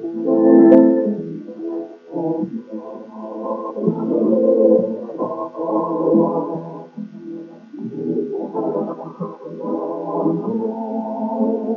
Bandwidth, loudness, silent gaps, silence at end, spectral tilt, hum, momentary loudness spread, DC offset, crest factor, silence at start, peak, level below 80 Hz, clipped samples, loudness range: 3.2 kHz; -19 LUFS; none; 0 s; -11 dB/octave; none; 19 LU; under 0.1%; 18 dB; 0 s; 0 dBFS; -74 dBFS; under 0.1%; 9 LU